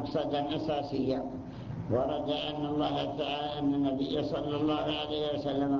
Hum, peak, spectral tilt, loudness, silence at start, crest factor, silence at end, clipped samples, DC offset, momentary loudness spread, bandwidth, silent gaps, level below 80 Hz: none; -16 dBFS; -7.5 dB/octave; -32 LUFS; 0 s; 14 dB; 0 s; under 0.1%; under 0.1%; 3 LU; 7.2 kHz; none; -54 dBFS